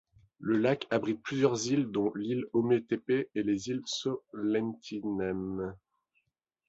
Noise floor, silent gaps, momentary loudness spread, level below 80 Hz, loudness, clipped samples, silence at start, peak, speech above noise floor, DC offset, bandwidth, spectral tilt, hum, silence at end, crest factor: -81 dBFS; none; 8 LU; -66 dBFS; -32 LUFS; under 0.1%; 0.4 s; -12 dBFS; 50 dB; under 0.1%; 8.2 kHz; -5.5 dB/octave; none; 0.9 s; 20 dB